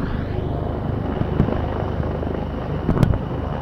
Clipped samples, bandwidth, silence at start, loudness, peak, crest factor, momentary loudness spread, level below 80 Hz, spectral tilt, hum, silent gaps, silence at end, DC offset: under 0.1%; 12 kHz; 0 s; -23 LUFS; -4 dBFS; 18 dB; 6 LU; -28 dBFS; -9 dB/octave; none; none; 0 s; under 0.1%